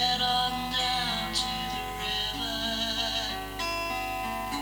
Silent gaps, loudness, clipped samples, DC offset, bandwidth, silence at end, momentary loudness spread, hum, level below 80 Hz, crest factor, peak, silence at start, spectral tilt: none; -29 LUFS; under 0.1%; under 0.1%; over 20 kHz; 0 s; 6 LU; 50 Hz at -45 dBFS; -46 dBFS; 16 dB; -14 dBFS; 0 s; -2.5 dB/octave